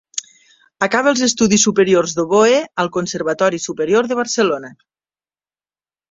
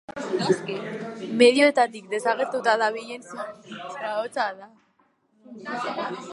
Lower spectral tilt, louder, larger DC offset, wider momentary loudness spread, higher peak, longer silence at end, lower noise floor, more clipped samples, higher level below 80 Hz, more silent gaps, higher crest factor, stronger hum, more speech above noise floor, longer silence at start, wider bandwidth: about the same, -3.5 dB/octave vs -4 dB/octave; first, -16 LUFS vs -24 LUFS; neither; second, 9 LU vs 18 LU; first, 0 dBFS vs -4 dBFS; first, 1.4 s vs 0 s; first, under -90 dBFS vs -66 dBFS; neither; first, -58 dBFS vs -76 dBFS; neither; second, 16 dB vs 22 dB; first, 50 Hz at -50 dBFS vs none; first, over 74 dB vs 41 dB; about the same, 0.15 s vs 0.1 s; second, 8 kHz vs 11.5 kHz